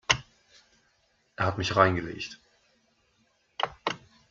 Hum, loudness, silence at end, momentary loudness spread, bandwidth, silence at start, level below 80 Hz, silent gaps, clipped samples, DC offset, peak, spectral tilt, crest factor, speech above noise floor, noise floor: none; -28 LUFS; 0.35 s; 21 LU; 7.6 kHz; 0.1 s; -58 dBFS; none; under 0.1%; under 0.1%; -4 dBFS; -4 dB/octave; 28 dB; 43 dB; -69 dBFS